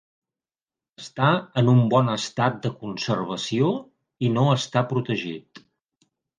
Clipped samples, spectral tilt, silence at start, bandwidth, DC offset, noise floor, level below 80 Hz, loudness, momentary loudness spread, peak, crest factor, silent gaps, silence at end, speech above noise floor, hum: under 0.1%; -6.5 dB/octave; 1 s; 9.4 kHz; under 0.1%; under -90 dBFS; -64 dBFS; -23 LUFS; 12 LU; -4 dBFS; 20 dB; none; 0.8 s; over 68 dB; none